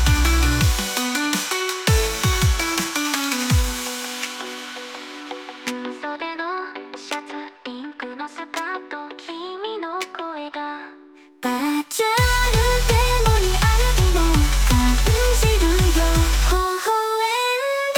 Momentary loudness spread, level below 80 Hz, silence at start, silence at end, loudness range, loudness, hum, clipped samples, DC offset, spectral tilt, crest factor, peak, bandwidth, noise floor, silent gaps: 15 LU; -24 dBFS; 0 s; 0 s; 12 LU; -21 LUFS; none; under 0.1%; under 0.1%; -4 dB/octave; 16 dB; -4 dBFS; 19 kHz; -47 dBFS; none